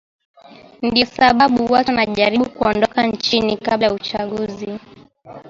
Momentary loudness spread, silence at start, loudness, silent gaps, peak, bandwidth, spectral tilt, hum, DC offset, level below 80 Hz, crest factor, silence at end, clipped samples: 11 LU; 0.5 s; -17 LUFS; none; 0 dBFS; 7.6 kHz; -5 dB/octave; none; under 0.1%; -48 dBFS; 18 dB; 0 s; under 0.1%